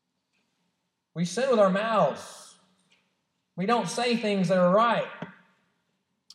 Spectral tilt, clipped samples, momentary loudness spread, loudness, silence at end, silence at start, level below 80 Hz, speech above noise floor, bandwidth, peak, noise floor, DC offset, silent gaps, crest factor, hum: -5.5 dB/octave; under 0.1%; 21 LU; -25 LUFS; 1.05 s; 1.15 s; -88 dBFS; 54 dB; 12.5 kHz; -10 dBFS; -78 dBFS; under 0.1%; none; 18 dB; none